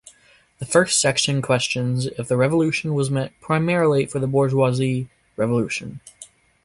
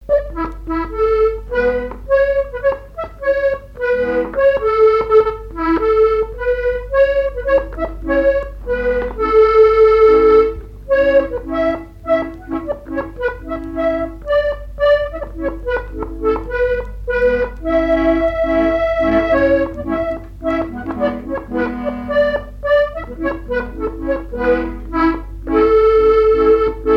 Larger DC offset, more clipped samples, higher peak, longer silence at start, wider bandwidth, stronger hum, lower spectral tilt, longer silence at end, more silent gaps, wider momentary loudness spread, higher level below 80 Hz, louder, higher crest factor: neither; neither; about the same, -2 dBFS vs -2 dBFS; first, 0.6 s vs 0 s; first, 11.5 kHz vs 6 kHz; neither; second, -4.5 dB/octave vs -7.5 dB/octave; first, 0.4 s vs 0 s; neither; about the same, 10 LU vs 12 LU; second, -56 dBFS vs -30 dBFS; second, -20 LUFS vs -16 LUFS; first, 20 dB vs 14 dB